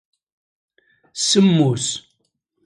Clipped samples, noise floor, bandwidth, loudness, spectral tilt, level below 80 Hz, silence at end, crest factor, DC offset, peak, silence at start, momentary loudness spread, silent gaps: under 0.1%; -71 dBFS; 11.5 kHz; -17 LUFS; -4.5 dB/octave; -62 dBFS; 0.65 s; 18 dB; under 0.1%; -4 dBFS; 1.15 s; 16 LU; none